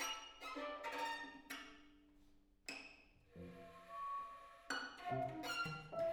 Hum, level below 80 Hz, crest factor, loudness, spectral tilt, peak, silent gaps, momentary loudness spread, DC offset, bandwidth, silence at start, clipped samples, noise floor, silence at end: none; -74 dBFS; 18 dB; -47 LUFS; -3 dB/octave; -30 dBFS; none; 15 LU; under 0.1%; over 20 kHz; 0 s; under 0.1%; -69 dBFS; 0 s